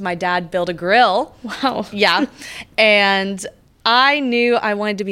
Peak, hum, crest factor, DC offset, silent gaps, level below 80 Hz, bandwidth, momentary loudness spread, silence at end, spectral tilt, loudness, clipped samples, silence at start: -2 dBFS; none; 16 dB; under 0.1%; none; -56 dBFS; 16 kHz; 12 LU; 0 s; -4 dB/octave; -16 LUFS; under 0.1%; 0 s